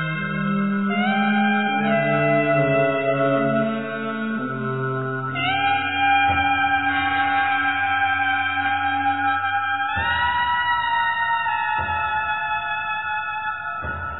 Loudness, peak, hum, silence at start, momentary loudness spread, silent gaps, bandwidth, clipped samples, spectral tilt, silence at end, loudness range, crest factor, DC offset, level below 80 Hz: -21 LUFS; -8 dBFS; none; 0 s; 7 LU; none; 4.1 kHz; under 0.1%; -9 dB/octave; 0 s; 3 LU; 14 dB; 0.3%; -50 dBFS